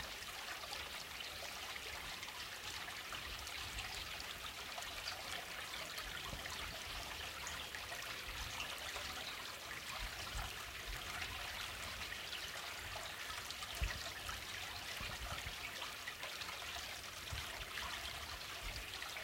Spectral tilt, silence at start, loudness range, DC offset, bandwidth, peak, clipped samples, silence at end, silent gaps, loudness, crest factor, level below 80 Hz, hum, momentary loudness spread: -1.5 dB/octave; 0 s; 1 LU; under 0.1%; 17 kHz; -26 dBFS; under 0.1%; 0 s; none; -45 LUFS; 20 dB; -56 dBFS; none; 2 LU